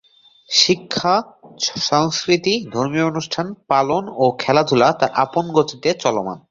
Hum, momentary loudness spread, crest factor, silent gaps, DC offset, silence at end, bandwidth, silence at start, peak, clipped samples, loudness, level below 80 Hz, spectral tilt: none; 7 LU; 18 dB; none; under 0.1%; 0.1 s; 7.8 kHz; 0.5 s; 0 dBFS; under 0.1%; -18 LUFS; -58 dBFS; -4 dB/octave